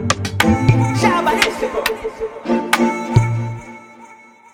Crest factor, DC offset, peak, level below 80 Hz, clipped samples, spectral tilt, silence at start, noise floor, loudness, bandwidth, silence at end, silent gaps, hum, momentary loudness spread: 18 dB; under 0.1%; 0 dBFS; -38 dBFS; under 0.1%; -5.5 dB/octave; 0 s; -43 dBFS; -17 LUFS; 18 kHz; 0.4 s; none; none; 12 LU